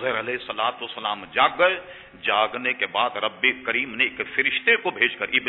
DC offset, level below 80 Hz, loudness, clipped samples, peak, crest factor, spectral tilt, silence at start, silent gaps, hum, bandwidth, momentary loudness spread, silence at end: under 0.1%; -64 dBFS; -22 LUFS; under 0.1%; -4 dBFS; 20 dB; -6 dB/octave; 0 s; none; none; 4.2 kHz; 9 LU; 0 s